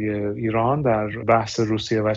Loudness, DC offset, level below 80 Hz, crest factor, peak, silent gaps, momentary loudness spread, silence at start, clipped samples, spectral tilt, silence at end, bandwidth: -22 LUFS; under 0.1%; -50 dBFS; 18 dB; -4 dBFS; none; 4 LU; 0 s; under 0.1%; -6.5 dB/octave; 0 s; 7.8 kHz